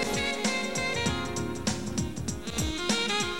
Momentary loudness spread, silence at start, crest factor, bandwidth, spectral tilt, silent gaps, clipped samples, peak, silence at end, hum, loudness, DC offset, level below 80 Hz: 6 LU; 0 s; 16 dB; 17 kHz; -3.5 dB/octave; none; under 0.1%; -14 dBFS; 0 s; none; -29 LUFS; 0.6%; -44 dBFS